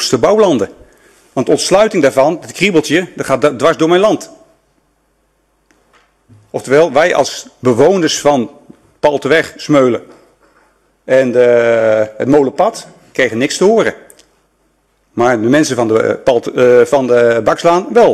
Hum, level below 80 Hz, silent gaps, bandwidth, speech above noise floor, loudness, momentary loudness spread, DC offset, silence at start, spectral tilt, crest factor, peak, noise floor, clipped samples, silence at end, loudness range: none; -50 dBFS; none; 13 kHz; 48 dB; -12 LUFS; 8 LU; under 0.1%; 0 s; -4.5 dB/octave; 12 dB; 0 dBFS; -59 dBFS; under 0.1%; 0 s; 4 LU